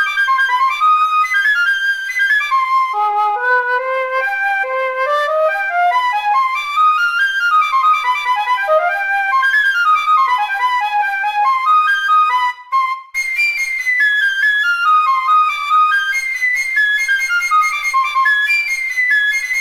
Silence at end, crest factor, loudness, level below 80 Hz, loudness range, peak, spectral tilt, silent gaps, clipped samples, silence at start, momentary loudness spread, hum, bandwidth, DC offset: 0 s; 10 dB; -14 LUFS; -60 dBFS; 2 LU; -4 dBFS; 2.5 dB/octave; none; under 0.1%; 0 s; 4 LU; none; 16 kHz; under 0.1%